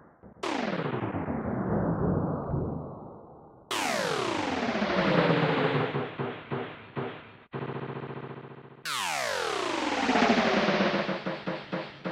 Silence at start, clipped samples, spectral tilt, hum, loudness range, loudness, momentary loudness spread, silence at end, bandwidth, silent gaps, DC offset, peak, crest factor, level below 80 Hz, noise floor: 0.25 s; under 0.1%; -5 dB/octave; none; 7 LU; -29 LUFS; 15 LU; 0 s; 16 kHz; none; under 0.1%; -10 dBFS; 18 dB; -54 dBFS; -51 dBFS